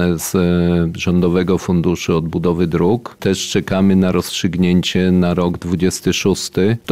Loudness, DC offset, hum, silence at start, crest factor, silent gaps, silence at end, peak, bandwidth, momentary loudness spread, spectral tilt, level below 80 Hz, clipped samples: -16 LUFS; 0.5%; none; 0 s; 12 dB; none; 0 s; -4 dBFS; 15.5 kHz; 4 LU; -6 dB/octave; -38 dBFS; under 0.1%